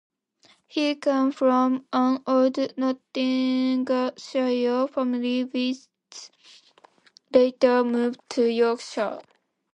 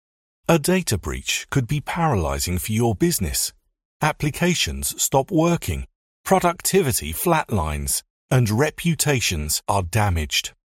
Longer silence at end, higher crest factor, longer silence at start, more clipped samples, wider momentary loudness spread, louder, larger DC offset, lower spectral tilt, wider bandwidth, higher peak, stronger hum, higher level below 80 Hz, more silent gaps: first, 0.55 s vs 0.3 s; about the same, 20 dB vs 18 dB; first, 0.75 s vs 0.5 s; neither; first, 9 LU vs 6 LU; second, -24 LUFS vs -21 LUFS; neither; about the same, -4.5 dB/octave vs -4 dB/octave; second, 9.2 kHz vs 16.5 kHz; about the same, -6 dBFS vs -4 dBFS; neither; second, -74 dBFS vs -36 dBFS; second, none vs 3.85-4.00 s, 5.95-6.24 s, 8.10-8.28 s